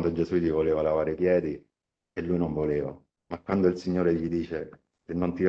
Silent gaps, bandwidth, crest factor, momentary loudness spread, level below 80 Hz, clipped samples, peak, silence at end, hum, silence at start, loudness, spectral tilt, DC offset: none; 7.6 kHz; 18 dB; 13 LU; -52 dBFS; under 0.1%; -10 dBFS; 0 s; none; 0 s; -27 LUFS; -9 dB/octave; under 0.1%